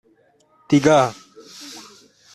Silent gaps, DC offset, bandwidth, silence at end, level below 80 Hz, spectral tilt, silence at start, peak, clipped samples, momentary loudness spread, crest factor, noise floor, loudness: none; under 0.1%; 13 kHz; 0.55 s; -60 dBFS; -5.5 dB/octave; 0.7 s; -2 dBFS; under 0.1%; 23 LU; 20 dB; -58 dBFS; -17 LUFS